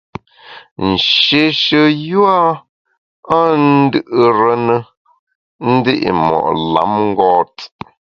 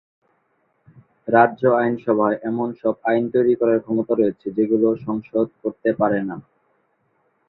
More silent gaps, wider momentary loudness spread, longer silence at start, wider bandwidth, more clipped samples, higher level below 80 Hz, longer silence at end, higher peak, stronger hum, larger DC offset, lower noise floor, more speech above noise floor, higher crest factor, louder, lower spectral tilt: first, 0.71-0.76 s, 2.69-2.85 s, 2.98-3.23 s, 4.97-5.05 s, 5.19-5.27 s, 5.35-5.59 s vs none; first, 12 LU vs 8 LU; second, 0.45 s vs 1.25 s; first, 6.8 kHz vs 4.2 kHz; neither; first, -48 dBFS vs -64 dBFS; second, 0.4 s vs 1.05 s; about the same, 0 dBFS vs -2 dBFS; neither; neither; second, -39 dBFS vs -67 dBFS; second, 26 dB vs 47 dB; about the same, 14 dB vs 18 dB; first, -13 LUFS vs -20 LUFS; second, -6.5 dB/octave vs -11 dB/octave